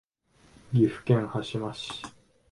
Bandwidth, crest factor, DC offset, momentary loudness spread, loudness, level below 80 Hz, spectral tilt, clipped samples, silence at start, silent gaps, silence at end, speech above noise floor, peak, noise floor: 11.5 kHz; 20 dB; under 0.1%; 14 LU; -28 LUFS; -60 dBFS; -7 dB/octave; under 0.1%; 0.7 s; none; 0.4 s; 35 dB; -10 dBFS; -62 dBFS